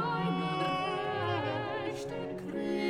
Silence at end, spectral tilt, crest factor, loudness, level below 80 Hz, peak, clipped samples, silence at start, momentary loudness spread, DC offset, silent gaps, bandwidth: 0 s; -6.5 dB/octave; 12 dB; -34 LUFS; -64 dBFS; -20 dBFS; under 0.1%; 0 s; 6 LU; under 0.1%; none; 12.5 kHz